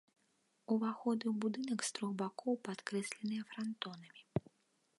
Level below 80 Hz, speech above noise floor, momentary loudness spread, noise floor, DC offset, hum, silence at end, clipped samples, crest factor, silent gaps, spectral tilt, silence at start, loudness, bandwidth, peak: -76 dBFS; 39 dB; 7 LU; -78 dBFS; under 0.1%; none; 0.6 s; under 0.1%; 20 dB; none; -5 dB/octave; 0.7 s; -40 LUFS; 11.5 kHz; -20 dBFS